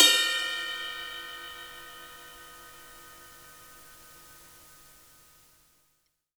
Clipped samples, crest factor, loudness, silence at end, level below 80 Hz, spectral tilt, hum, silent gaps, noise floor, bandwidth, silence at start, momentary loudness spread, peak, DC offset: under 0.1%; 28 dB; -28 LUFS; 2 s; -66 dBFS; 1.5 dB/octave; none; none; -74 dBFS; over 20 kHz; 0 s; 23 LU; -4 dBFS; under 0.1%